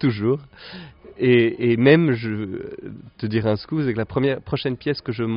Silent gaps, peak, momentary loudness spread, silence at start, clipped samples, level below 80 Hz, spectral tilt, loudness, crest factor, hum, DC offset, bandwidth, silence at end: none; -2 dBFS; 21 LU; 0 s; under 0.1%; -52 dBFS; -6 dB/octave; -21 LUFS; 20 dB; none; under 0.1%; 5.4 kHz; 0 s